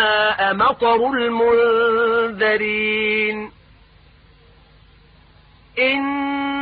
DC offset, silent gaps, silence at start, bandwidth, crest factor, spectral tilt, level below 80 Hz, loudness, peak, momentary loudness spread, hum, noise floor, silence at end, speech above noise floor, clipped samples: under 0.1%; none; 0 s; 4.9 kHz; 14 dB; -9 dB/octave; -52 dBFS; -18 LUFS; -4 dBFS; 6 LU; none; -50 dBFS; 0 s; 32 dB; under 0.1%